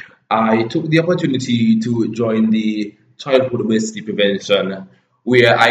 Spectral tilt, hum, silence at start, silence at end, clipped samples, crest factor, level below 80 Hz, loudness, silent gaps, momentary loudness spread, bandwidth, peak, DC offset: -5.5 dB/octave; none; 0.3 s; 0 s; under 0.1%; 16 dB; -60 dBFS; -16 LUFS; none; 10 LU; 9 kHz; 0 dBFS; under 0.1%